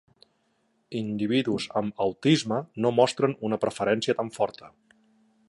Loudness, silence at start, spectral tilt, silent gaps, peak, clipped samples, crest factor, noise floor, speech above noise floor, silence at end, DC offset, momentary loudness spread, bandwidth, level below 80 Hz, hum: -26 LUFS; 0.9 s; -5.5 dB/octave; none; -6 dBFS; under 0.1%; 20 dB; -70 dBFS; 45 dB; 0.8 s; under 0.1%; 8 LU; 11.5 kHz; -66 dBFS; none